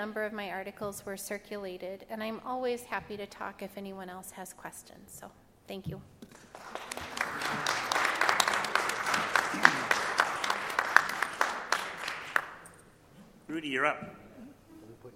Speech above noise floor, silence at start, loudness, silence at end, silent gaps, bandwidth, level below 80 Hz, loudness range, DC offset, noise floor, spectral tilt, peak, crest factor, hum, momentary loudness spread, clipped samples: 19 dB; 0 s; -31 LUFS; 0 s; none; 16.5 kHz; -66 dBFS; 15 LU; under 0.1%; -57 dBFS; -2 dB/octave; 0 dBFS; 34 dB; none; 21 LU; under 0.1%